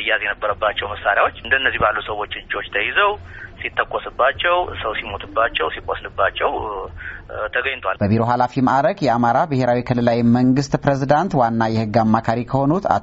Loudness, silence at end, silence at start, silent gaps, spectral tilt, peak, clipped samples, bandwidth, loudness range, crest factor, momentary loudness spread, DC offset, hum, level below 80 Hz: -19 LUFS; 0 s; 0 s; none; -4 dB/octave; 0 dBFS; under 0.1%; 7.8 kHz; 4 LU; 18 dB; 10 LU; under 0.1%; none; -42 dBFS